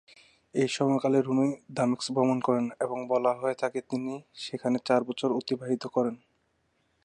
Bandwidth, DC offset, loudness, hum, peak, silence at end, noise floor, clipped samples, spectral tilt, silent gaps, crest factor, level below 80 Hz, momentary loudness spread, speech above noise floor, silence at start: 10 kHz; under 0.1%; -29 LUFS; none; -10 dBFS; 0.9 s; -73 dBFS; under 0.1%; -6 dB/octave; none; 18 dB; -76 dBFS; 8 LU; 45 dB; 0.55 s